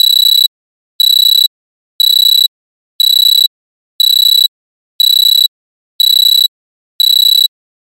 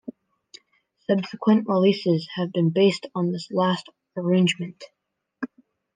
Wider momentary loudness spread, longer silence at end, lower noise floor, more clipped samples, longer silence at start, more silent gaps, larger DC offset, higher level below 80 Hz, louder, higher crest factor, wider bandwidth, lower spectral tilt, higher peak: second, 8 LU vs 17 LU; about the same, 0.5 s vs 0.5 s; first, under -90 dBFS vs -68 dBFS; neither; second, 0 s vs 1.1 s; first, 0.47-0.99 s, 1.47-1.99 s, 2.48-2.99 s, 3.47-3.99 s, 4.48-4.99 s, 5.48-5.99 s, 6.48-6.99 s vs none; neither; second, under -90 dBFS vs -74 dBFS; first, -7 LUFS vs -23 LUFS; second, 10 dB vs 18 dB; first, 17 kHz vs 9.6 kHz; second, 11.5 dB/octave vs -6.5 dB/octave; first, 0 dBFS vs -6 dBFS